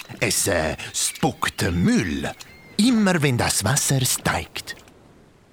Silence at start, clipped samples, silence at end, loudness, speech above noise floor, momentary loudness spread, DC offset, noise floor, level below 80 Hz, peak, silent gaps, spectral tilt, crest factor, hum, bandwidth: 0.1 s; under 0.1%; 0.75 s; -21 LUFS; 30 dB; 13 LU; under 0.1%; -51 dBFS; -44 dBFS; -4 dBFS; none; -4 dB/octave; 18 dB; none; over 20 kHz